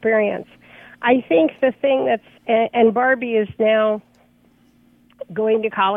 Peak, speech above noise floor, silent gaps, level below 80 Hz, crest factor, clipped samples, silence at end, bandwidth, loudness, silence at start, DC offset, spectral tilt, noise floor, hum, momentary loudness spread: -2 dBFS; 38 dB; none; -64 dBFS; 16 dB; under 0.1%; 0 s; 3.9 kHz; -18 LUFS; 0 s; under 0.1%; -8 dB/octave; -55 dBFS; 60 Hz at -50 dBFS; 8 LU